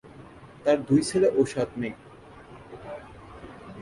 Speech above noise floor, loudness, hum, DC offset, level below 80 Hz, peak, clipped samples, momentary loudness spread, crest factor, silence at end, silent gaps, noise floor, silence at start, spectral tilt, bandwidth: 24 dB; -25 LUFS; none; under 0.1%; -56 dBFS; -10 dBFS; under 0.1%; 25 LU; 18 dB; 0 s; none; -47 dBFS; 0.05 s; -6 dB/octave; 11.5 kHz